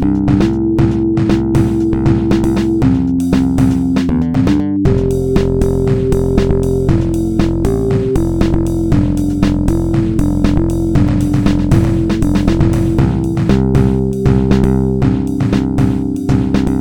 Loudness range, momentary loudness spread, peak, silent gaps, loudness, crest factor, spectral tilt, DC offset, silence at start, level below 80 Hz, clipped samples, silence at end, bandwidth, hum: 1 LU; 2 LU; 0 dBFS; none; -13 LUFS; 12 dB; -8.5 dB/octave; under 0.1%; 0 s; -22 dBFS; under 0.1%; 0 s; 18 kHz; none